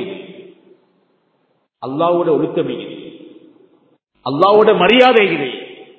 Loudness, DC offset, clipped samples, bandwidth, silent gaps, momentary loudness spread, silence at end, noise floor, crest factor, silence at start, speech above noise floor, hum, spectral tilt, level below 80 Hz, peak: -13 LUFS; under 0.1%; under 0.1%; 8 kHz; none; 22 LU; 0.15 s; -63 dBFS; 16 dB; 0 s; 51 dB; none; -7 dB/octave; -60 dBFS; 0 dBFS